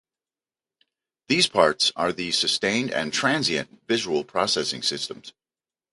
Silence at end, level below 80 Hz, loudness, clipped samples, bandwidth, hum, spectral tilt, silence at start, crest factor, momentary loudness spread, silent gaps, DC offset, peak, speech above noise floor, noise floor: 0.65 s; -62 dBFS; -23 LUFS; under 0.1%; 11.5 kHz; none; -2.5 dB/octave; 1.3 s; 22 dB; 7 LU; none; under 0.1%; -2 dBFS; over 66 dB; under -90 dBFS